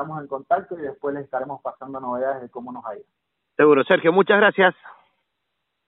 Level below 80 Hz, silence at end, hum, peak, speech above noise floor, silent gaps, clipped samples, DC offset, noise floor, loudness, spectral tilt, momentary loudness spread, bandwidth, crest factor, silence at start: -70 dBFS; 0.95 s; none; -4 dBFS; 56 dB; none; under 0.1%; under 0.1%; -77 dBFS; -20 LUFS; -3 dB/octave; 18 LU; 4 kHz; 20 dB; 0 s